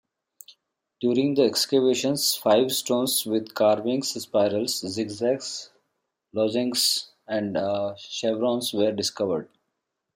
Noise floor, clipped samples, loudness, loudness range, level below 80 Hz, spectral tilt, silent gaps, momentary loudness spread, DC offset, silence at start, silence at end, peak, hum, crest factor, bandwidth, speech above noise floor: -80 dBFS; under 0.1%; -24 LUFS; 4 LU; -72 dBFS; -3.5 dB/octave; none; 8 LU; under 0.1%; 0.5 s; 0.7 s; -8 dBFS; none; 18 dB; 16.5 kHz; 56 dB